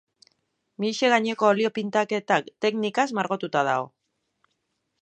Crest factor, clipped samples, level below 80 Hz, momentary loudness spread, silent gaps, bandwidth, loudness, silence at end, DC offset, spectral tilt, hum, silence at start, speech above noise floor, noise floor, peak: 22 dB; under 0.1%; -78 dBFS; 7 LU; none; 9 kHz; -24 LUFS; 1.15 s; under 0.1%; -4.5 dB/octave; none; 0.8 s; 53 dB; -76 dBFS; -4 dBFS